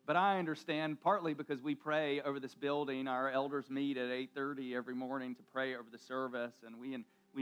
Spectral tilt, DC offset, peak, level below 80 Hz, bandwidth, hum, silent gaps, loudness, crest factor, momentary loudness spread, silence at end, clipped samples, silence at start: -6.5 dB/octave; under 0.1%; -20 dBFS; under -90 dBFS; 14 kHz; none; none; -38 LUFS; 18 dB; 11 LU; 0 s; under 0.1%; 0.05 s